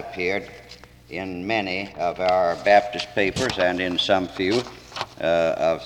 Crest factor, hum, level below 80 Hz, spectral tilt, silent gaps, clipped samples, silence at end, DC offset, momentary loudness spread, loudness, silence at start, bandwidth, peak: 18 dB; none; -52 dBFS; -4.5 dB/octave; none; under 0.1%; 0 s; under 0.1%; 14 LU; -23 LUFS; 0 s; 13.5 kHz; -6 dBFS